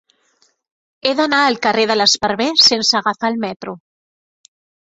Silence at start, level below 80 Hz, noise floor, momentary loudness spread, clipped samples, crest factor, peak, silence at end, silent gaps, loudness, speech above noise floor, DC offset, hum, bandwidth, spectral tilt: 1.05 s; -58 dBFS; -60 dBFS; 13 LU; under 0.1%; 18 dB; 0 dBFS; 1.1 s; 3.56-3.60 s; -14 LUFS; 45 dB; under 0.1%; none; 8 kHz; -2 dB/octave